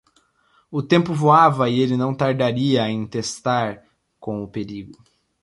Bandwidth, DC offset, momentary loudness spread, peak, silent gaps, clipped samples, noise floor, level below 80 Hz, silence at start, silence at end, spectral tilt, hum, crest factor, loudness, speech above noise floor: 11.5 kHz; under 0.1%; 16 LU; -2 dBFS; none; under 0.1%; -61 dBFS; -58 dBFS; 0.7 s; 0.5 s; -6 dB/octave; none; 18 dB; -20 LUFS; 42 dB